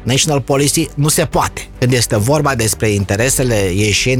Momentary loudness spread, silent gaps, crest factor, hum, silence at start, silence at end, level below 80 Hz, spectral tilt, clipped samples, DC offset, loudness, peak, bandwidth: 3 LU; none; 12 dB; none; 0 s; 0 s; -32 dBFS; -4 dB/octave; under 0.1%; under 0.1%; -14 LUFS; -2 dBFS; 17.5 kHz